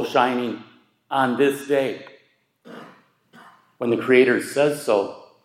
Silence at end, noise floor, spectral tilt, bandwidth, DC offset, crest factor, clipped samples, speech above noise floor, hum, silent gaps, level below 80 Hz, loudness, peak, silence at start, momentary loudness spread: 0.25 s; -60 dBFS; -5 dB/octave; 15.5 kHz; under 0.1%; 20 dB; under 0.1%; 40 dB; none; none; -74 dBFS; -21 LUFS; -4 dBFS; 0 s; 21 LU